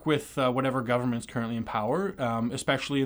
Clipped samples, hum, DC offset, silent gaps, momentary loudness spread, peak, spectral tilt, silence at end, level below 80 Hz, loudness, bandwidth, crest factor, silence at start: under 0.1%; none; under 0.1%; none; 5 LU; -12 dBFS; -5.5 dB/octave; 0 s; -58 dBFS; -29 LUFS; over 20 kHz; 16 dB; 0 s